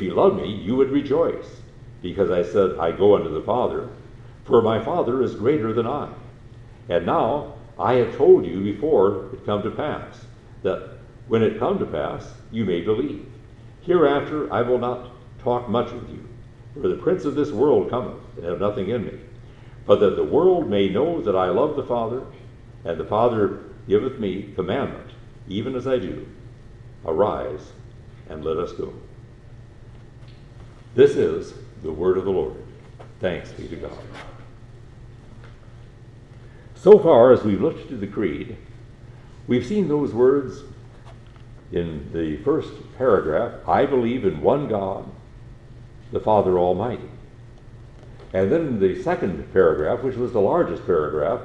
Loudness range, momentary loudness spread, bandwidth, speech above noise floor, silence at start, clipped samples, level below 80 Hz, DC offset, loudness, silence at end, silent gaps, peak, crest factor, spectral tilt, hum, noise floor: 9 LU; 18 LU; 8.2 kHz; 23 dB; 0 s; under 0.1%; -46 dBFS; under 0.1%; -21 LUFS; 0 s; none; 0 dBFS; 22 dB; -8 dB/octave; none; -44 dBFS